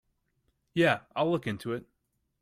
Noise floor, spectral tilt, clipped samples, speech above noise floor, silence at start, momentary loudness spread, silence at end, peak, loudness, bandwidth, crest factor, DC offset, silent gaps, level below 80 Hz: -75 dBFS; -6.5 dB/octave; under 0.1%; 47 dB; 0.75 s; 11 LU; 0.6 s; -12 dBFS; -30 LUFS; 15.5 kHz; 20 dB; under 0.1%; none; -68 dBFS